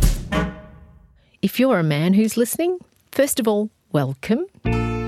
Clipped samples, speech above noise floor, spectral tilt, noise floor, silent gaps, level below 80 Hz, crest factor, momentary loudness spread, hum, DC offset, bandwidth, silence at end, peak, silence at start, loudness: under 0.1%; 33 dB; -5.5 dB/octave; -52 dBFS; none; -30 dBFS; 16 dB; 8 LU; none; under 0.1%; 17 kHz; 0 s; -4 dBFS; 0 s; -21 LUFS